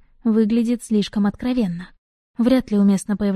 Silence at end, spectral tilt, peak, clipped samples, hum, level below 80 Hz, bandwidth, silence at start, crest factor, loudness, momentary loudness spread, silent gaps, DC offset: 0 s; -7 dB/octave; -4 dBFS; under 0.1%; none; -48 dBFS; 12.5 kHz; 0.25 s; 16 dB; -20 LUFS; 6 LU; 1.98-2.34 s; under 0.1%